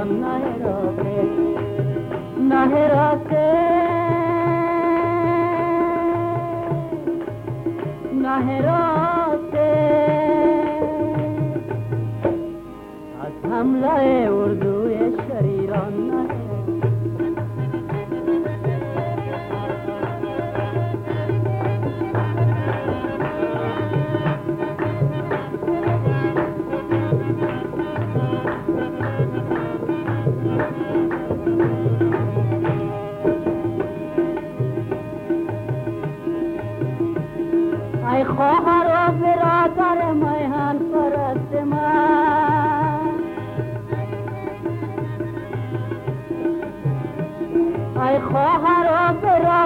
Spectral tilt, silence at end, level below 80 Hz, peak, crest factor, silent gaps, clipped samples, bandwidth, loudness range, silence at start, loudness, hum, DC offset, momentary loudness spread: -9.5 dB/octave; 0 s; -48 dBFS; -6 dBFS; 14 dB; none; under 0.1%; 4.9 kHz; 6 LU; 0 s; -21 LUFS; none; under 0.1%; 10 LU